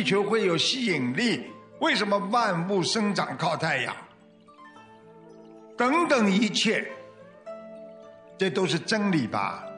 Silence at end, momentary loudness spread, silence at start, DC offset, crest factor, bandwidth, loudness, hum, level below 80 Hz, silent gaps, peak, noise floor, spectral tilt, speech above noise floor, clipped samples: 0 s; 20 LU; 0 s; under 0.1%; 18 dB; 10 kHz; -25 LUFS; none; -76 dBFS; none; -10 dBFS; -54 dBFS; -4.5 dB/octave; 29 dB; under 0.1%